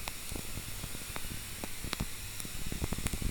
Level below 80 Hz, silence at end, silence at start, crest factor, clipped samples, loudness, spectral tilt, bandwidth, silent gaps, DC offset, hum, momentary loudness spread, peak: -44 dBFS; 0 s; 0 s; 26 dB; under 0.1%; -39 LUFS; -3 dB/octave; over 20 kHz; none; under 0.1%; none; 4 LU; -10 dBFS